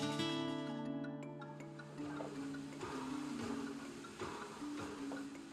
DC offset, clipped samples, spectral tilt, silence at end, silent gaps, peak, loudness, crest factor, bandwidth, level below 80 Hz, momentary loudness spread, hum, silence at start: under 0.1%; under 0.1%; -5 dB/octave; 0 s; none; -26 dBFS; -45 LUFS; 20 dB; 13.5 kHz; -72 dBFS; 9 LU; none; 0 s